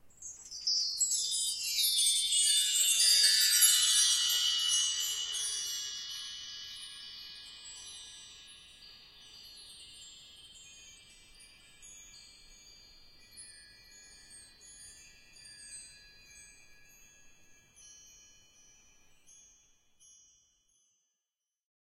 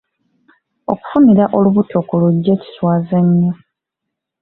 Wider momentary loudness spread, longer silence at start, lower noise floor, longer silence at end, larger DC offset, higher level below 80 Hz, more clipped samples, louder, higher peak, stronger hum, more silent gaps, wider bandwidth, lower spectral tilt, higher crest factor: first, 29 LU vs 12 LU; second, 0.05 s vs 0.9 s; first, under -90 dBFS vs -79 dBFS; first, 4 s vs 0.9 s; neither; second, -70 dBFS vs -54 dBFS; neither; second, -26 LUFS vs -14 LUFS; second, -12 dBFS vs 0 dBFS; neither; neither; first, 16 kHz vs 4.2 kHz; second, 4.5 dB/octave vs -12.5 dB/octave; first, 24 dB vs 14 dB